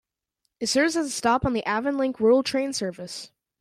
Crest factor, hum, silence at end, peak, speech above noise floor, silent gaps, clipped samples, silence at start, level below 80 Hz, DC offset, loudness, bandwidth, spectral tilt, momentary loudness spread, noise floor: 16 dB; none; 0.35 s; -10 dBFS; 54 dB; none; under 0.1%; 0.6 s; -52 dBFS; under 0.1%; -24 LUFS; 15 kHz; -4 dB/octave; 12 LU; -78 dBFS